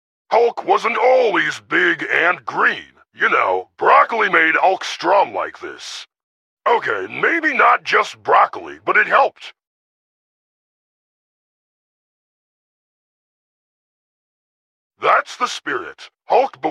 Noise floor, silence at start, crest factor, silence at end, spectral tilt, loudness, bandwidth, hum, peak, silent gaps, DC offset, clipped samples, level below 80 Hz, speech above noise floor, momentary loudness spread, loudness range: under -90 dBFS; 0.3 s; 18 dB; 0 s; -3 dB/octave; -16 LUFS; 11.5 kHz; none; 0 dBFS; 6.23-6.57 s, 9.67-14.90 s; under 0.1%; under 0.1%; -72 dBFS; over 73 dB; 12 LU; 8 LU